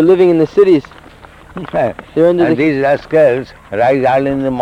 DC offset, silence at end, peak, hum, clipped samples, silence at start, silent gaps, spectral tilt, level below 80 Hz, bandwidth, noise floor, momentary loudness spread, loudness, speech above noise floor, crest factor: under 0.1%; 0 s; -2 dBFS; none; under 0.1%; 0 s; none; -8 dB/octave; -44 dBFS; 9.8 kHz; -38 dBFS; 11 LU; -12 LUFS; 26 dB; 12 dB